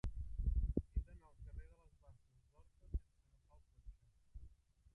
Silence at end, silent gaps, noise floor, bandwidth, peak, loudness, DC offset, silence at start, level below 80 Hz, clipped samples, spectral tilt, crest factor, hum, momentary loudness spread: 0.45 s; none; -73 dBFS; 3.9 kHz; -22 dBFS; -46 LUFS; under 0.1%; 0.05 s; -48 dBFS; under 0.1%; -10 dB/octave; 24 dB; none; 23 LU